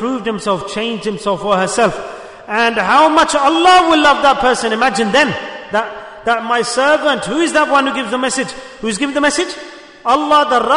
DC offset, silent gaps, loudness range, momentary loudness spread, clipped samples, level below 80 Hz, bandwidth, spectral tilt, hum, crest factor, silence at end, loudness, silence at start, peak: under 0.1%; none; 4 LU; 13 LU; under 0.1%; -46 dBFS; 11 kHz; -3 dB/octave; none; 14 dB; 0 s; -14 LUFS; 0 s; 0 dBFS